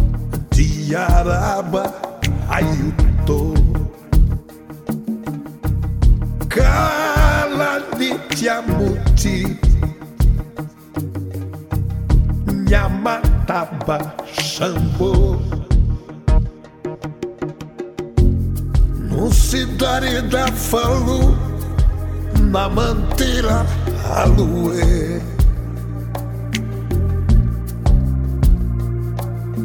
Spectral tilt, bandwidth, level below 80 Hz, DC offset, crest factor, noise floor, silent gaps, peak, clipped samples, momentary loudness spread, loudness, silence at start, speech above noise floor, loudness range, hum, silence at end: -6 dB/octave; 18 kHz; -18 dBFS; under 0.1%; 16 dB; -36 dBFS; none; 0 dBFS; under 0.1%; 10 LU; -19 LUFS; 0 s; 20 dB; 3 LU; none; 0 s